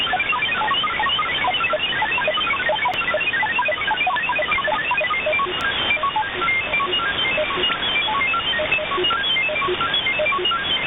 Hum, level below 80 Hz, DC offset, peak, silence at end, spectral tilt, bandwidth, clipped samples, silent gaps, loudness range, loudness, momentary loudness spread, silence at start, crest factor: none; -48 dBFS; under 0.1%; -8 dBFS; 0 s; -4.5 dB/octave; 8.6 kHz; under 0.1%; none; 1 LU; -19 LUFS; 1 LU; 0 s; 12 dB